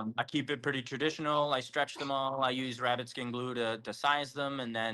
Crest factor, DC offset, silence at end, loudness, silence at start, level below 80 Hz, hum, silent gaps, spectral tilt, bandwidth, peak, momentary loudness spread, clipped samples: 18 dB; under 0.1%; 0 s; -33 LUFS; 0 s; -76 dBFS; none; none; -4.5 dB/octave; 12.5 kHz; -16 dBFS; 5 LU; under 0.1%